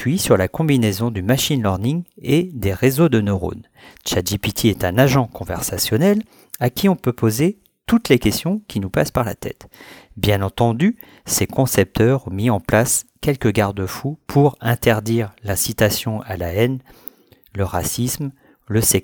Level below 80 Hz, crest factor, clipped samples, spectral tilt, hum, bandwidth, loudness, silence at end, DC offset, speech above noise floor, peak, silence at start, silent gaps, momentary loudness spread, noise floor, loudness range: -42 dBFS; 18 dB; under 0.1%; -5 dB/octave; none; over 20 kHz; -19 LUFS; 0.05 s; under 0.1%; 23 dB; -2 dBFS; 0 s; none; 9 LU; -41 dBFS; 3 LU